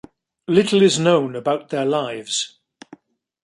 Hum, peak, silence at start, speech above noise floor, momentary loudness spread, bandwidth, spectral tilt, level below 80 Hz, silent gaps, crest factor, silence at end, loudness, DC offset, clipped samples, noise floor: none; -2 dBFS; 0.5 s; 30 dB; 9 LU; 11.5 kHz; -4.5 dB/octave; -66 dBFS; none; 18 dB; 0.95 s; -19 LUFS; under 0.1%; under 0.1%; -48 dBFS